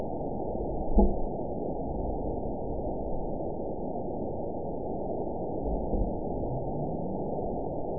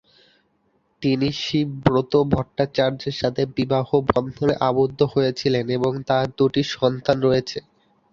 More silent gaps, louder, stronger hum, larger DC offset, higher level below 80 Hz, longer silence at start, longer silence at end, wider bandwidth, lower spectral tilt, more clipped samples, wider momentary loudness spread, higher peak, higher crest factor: neither; second, -33 LUFS vs -21 LUFS; neither; first, 1% vs under 0.1%; first, -36 dBFS vs -48 dBFS; second, 0 s vs 1 s; second, 0 s vs 0.5 s; second, 1 kHz vs 7.4 kHz; first, -16 dB/octave vs -7 dB/octave; neither; about the same, 6 LU vs 4 LU; second, -10 dBFS vs -2 dBFS; about the same, 20 dB vs 20 dB